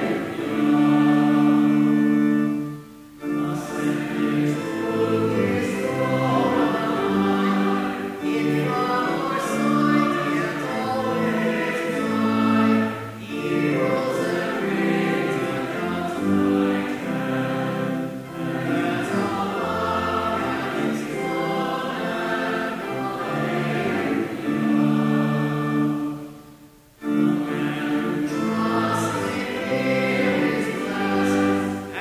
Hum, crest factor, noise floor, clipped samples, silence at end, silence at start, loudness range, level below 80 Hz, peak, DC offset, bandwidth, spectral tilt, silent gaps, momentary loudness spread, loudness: none; 14 dB; -49 dBFS; under 0.1%; 0 s; 0 s; 3 LU; -54 dBFS; -8 dBFS; under 0.1%; 16 kHz; -6.5 dB/octave; none; 7 LU; -23 LUFS